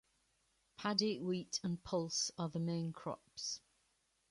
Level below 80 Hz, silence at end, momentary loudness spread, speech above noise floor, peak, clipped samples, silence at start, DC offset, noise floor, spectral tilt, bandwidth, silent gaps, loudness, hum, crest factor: -74 dBFS; 0.75 s; 8 LU; 39 dB; -18 dBFS; under 0.1%; 0.8 s; under 0.1%; -79 dBFS; -4 dB/octave; 11.5 kHz; none; -40 LUFS; none; 24 dB